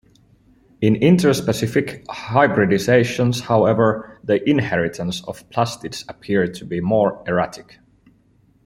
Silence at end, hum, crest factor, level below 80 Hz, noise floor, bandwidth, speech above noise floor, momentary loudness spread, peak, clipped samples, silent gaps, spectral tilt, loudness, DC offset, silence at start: 1.05 s; none; 18 dB; -52 dBFS; -57 dBFS; 16 kHz; 38 dB; 12 LU; -2 dBFS; under 0.1%; none; -6 dB/octave; -19 LUFS; under 0.1%; 0.8 s